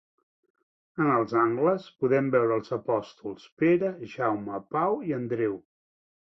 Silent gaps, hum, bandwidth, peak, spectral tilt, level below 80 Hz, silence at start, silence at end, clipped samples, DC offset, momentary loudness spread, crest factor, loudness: 3.52-3.57 s; none; 6.2 kHz; -10 dBFS; -8.5 dB/octave; -70 dBFS; 0.95 s; 0.8 s; under 0.1%; under 0.1%; 10 LU; 18 dB; -27 LUFS